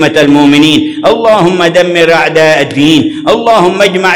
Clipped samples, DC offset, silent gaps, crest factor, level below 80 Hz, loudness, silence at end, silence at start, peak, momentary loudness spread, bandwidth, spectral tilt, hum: 8%; under 0.1%; none; 6 dB; -42 dBFS; -6 LUFS; 0 s; 0 s; 0 dBFS; 4 LU; 17 kHz; -5 dB/octave; none